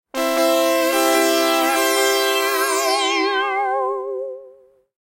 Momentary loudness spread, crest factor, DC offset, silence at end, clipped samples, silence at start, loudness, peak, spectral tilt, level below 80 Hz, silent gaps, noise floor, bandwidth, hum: 9 LU; 14 dB; under 0.1%; 0.7 s; under 0.1%; 0.15 s; -18 LUFS; -6 dBFS; 1 dB/octave; -68 dBFS; none; -49 dBFS; 16 kHz; none